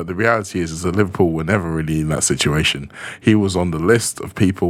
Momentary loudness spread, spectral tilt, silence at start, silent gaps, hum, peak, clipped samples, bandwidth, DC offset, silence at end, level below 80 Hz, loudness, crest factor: 6 LU; -4.5 dB/octave; 0 s; none; none; 0 dBFS; under 0.1%; 16 kHz; under 0.1%; 0 s; -38 dBFS; -18 LUFS; 18 dB